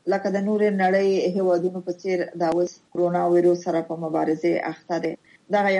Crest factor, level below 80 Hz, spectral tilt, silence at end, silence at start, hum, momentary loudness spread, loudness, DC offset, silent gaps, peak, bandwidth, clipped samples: 14 dB; -72 dBFS; -7 dB/octave; 0 s; 0.05 s; none; 8 LU; -23 LUFS; under 0.1%; none; -10 dBFS; 9.4 kHz; under 0.1%